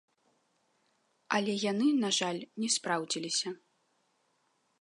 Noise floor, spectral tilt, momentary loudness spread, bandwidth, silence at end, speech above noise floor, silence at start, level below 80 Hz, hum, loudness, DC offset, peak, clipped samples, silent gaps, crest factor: -75 dBFS; -3 dB/octave; 8 LU; 11.5 kHz; 1.25 s; 44 dB; 1.3 s; -86 dBFS; none; -31 LUFS; under 0.1%; -12 dBFS; under 0.1%; none; 22 dB